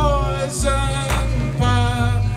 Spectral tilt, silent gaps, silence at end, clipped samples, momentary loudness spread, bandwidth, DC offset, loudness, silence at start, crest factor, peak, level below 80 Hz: -5.5 dB/octave; none; 0 s; under 0.1%; 3 LU; 14.5 kHz; under 0.1%; -20 LUFS; 0 s; 14 dB; -4 dBFS; -24 dBFS